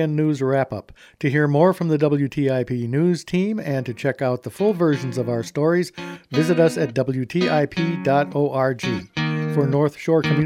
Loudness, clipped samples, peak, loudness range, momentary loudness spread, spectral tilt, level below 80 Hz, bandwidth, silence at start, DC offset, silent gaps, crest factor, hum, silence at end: -21 LUFS; under 0.1%; -4 dBFS; 2 LU; 7 LU; -7 dB/octave; -58 dBFS; 15 kHz; 0 s; under 0.1%; none; 16 dB; none; 0 s